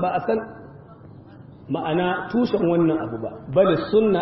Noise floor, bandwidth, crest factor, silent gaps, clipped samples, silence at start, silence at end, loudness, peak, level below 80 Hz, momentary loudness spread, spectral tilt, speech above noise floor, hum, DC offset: -44 dBFS; 5.8 kHz; 16 dB; none; under 0.1%; 0 s; 0 s; -22 LUFS; -6 dBFS; -52 dBFS; 11 LU; -11 dB/octave; 23 dB; none; under 0.1%